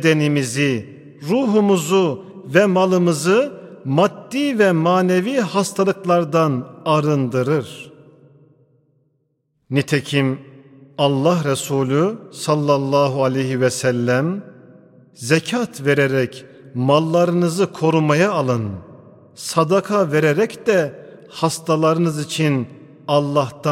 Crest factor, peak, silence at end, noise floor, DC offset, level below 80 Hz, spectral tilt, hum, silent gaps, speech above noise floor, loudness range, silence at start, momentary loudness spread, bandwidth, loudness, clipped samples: 18 dB; 0 dBFS; 0 s; -68 dBFS; under 0.1%; -66 dBFS; -6 dB/octave; none; none; 51 dB; 5 LU; 0 s; 10 LU; 16 kHz; -18 LUFS; under 0.1%